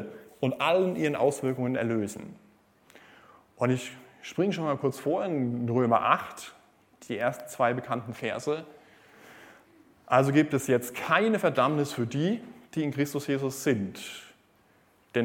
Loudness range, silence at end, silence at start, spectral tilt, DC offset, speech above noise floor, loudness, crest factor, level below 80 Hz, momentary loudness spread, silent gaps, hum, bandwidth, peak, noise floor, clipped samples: 6 LU; 0 s; 0 s; -6 dB/octave; under 0.1%; 36 dB; -28 LUFS; 22 dB; -72 dBFS; 14 LU; none; none; 17 kHz; -6 dBFS; -63 dBFS; under 0.1%